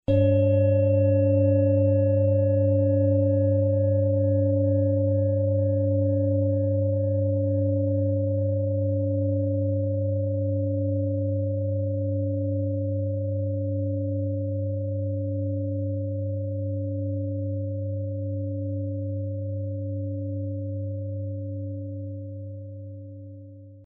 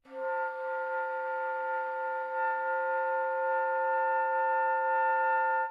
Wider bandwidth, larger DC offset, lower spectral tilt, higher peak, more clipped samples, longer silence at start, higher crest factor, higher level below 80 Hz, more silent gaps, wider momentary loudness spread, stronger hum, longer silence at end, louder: second, 3.5 kHz vs 4.9 kHz; neither; first, -13.5 dB/octave vs -3 dB/octave; first, -10 dBFS vs -20 dBFS; neither; about the same, 0.1 s vs 0.05 s; about the same, 14 dB vs 10 dB; first, -56 dBFS vs -86 dBFS; neither; first, 11 LU vs 6 LU; neither; about the same, 0 s vs 0 s; first, -25 LUFS vs -30 LUFS